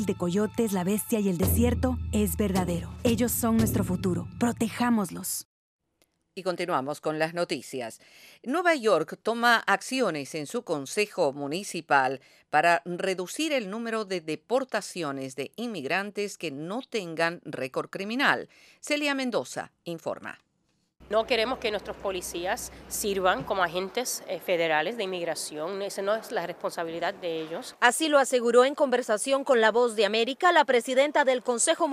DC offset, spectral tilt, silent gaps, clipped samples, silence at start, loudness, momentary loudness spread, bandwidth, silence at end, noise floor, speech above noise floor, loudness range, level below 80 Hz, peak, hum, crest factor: under 0.1%; -4 dB/octave; 5.45-5.79 s; under 0.1%; 0 s; -27 LUFS; 11 LU; 15.5 kHz; 0 s; -73 dBFS; 46 dB; 7 LU; -48 dBFS; -6 dBFS; none; 22 dB